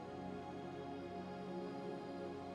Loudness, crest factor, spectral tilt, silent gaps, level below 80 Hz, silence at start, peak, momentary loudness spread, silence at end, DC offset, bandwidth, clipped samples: -48 LUFS; 12 dB; -7 dB/octave; none; -74 dBFS; 0 s; -36 dBFS; 2 LU; 0 s; under 0.1%; 12 kHz; under 0.1%